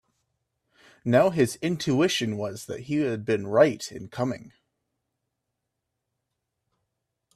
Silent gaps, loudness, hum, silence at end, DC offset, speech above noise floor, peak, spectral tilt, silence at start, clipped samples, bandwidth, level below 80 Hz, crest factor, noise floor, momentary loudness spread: none; -25 LUFS; none; 2.85 s; under 0.1%; 58 dB; -6 dBFS; -5.5 dB/octave; 1.05 s; under 0.1%; 14 kHz; -66 dBFS; 22 dB; -82 dBFS; 14 LU